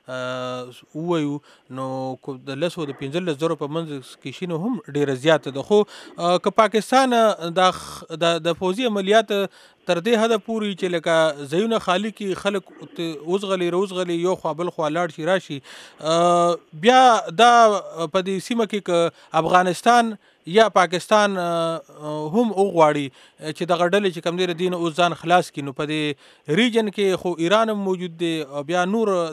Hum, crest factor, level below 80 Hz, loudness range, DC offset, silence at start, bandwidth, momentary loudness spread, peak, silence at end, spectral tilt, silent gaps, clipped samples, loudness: none; 18 dB; -66 dBFS; 7 LU; under 0.1%; 0.1 s; 14 kHz; 13 LU; -2 dBFS; 0 s; -5 dB/octave; none; under 0.1%; -21 LUFS